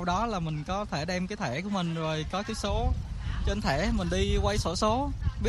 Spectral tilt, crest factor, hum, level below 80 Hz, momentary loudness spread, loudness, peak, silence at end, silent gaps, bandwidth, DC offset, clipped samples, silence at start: -5.5 dB/octave; 16 dB; none; -34 dBFS; 5 LU; -30 LUFS; -14 dBFS; 0 s; none; 12.5 kHz; under 0.1%; under 0.1%; 0 s